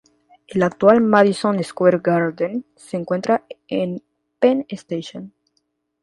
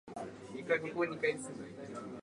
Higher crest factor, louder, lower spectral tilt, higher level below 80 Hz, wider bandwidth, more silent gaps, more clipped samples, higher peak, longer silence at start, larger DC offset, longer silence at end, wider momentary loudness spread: about the same, 20 dB vs 20 dB; first, -19 LUFS vs -38 LUFS; first, -7 dB/octave vs -5 dB/octave; first, -62 dBFS vs -74 dBFS; about the same, 11.5 kHz vs 11.5 kHz; neither; neither; first, 0 dBFS vs -20 dBFS; first, 0.5 s vs 0.05 s; neither; first, 0.75 s vs 0 s; first, 15 LU vs 12 LU